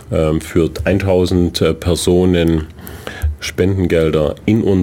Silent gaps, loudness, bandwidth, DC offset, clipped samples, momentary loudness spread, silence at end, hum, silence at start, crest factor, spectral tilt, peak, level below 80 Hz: none; -15 LUFS; 17 kHz; under 0.1%; under 0.1%; 9 LU; 0 s; none; 0 s; 12 dB; -6.5 dB/octave; -2 dBFS; -28 dBFS